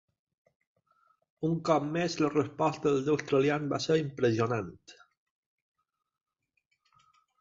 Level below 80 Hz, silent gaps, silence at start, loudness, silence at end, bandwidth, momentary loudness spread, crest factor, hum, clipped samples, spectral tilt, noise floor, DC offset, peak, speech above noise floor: -68 dBFS; none; 1.4 s; -29 LUFS; 2.5 s; 7.8 kHz; 5 LU; 20 dB; none; under 0.1%; -6 dB/octave; -79 dBFS; under 0.1%; -12 dBFS; 50 dB